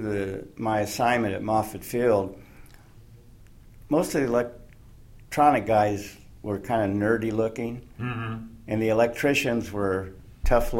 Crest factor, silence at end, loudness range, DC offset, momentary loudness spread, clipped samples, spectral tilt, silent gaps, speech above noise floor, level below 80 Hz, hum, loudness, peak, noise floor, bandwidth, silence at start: 20 dB; 0 s; 3 LU; under 0.1%; 13 LU; under 0.1%; -6 dB/octave; none; 25 dB; -40 dBFS; none; -26 LUFS; -6 dBFS; -50 dBFS; 16.5 kHz; 0 s